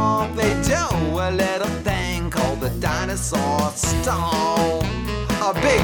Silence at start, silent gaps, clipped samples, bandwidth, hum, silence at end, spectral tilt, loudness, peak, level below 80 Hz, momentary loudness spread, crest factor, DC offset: 0 s; none; under 0.1%; over 20 kHz; none; 0 s; -4.5 dB/octave; -21 LUFS; -4 dBFS; -32 dBFS; 4 LU; 16 dB; under 0.1%